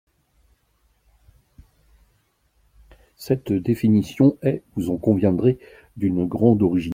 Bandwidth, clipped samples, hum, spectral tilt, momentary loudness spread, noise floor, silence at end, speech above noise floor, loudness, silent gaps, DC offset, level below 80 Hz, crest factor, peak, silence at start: 16 kHz; under 0.1%; none; -9 dB/octave; 9 LU; -65 dBFS; 0 s; 45 dB; -21 LUFS; none; under 0.1%; -52 dBFS; 20 dB; -4 dBFS; 3.2 s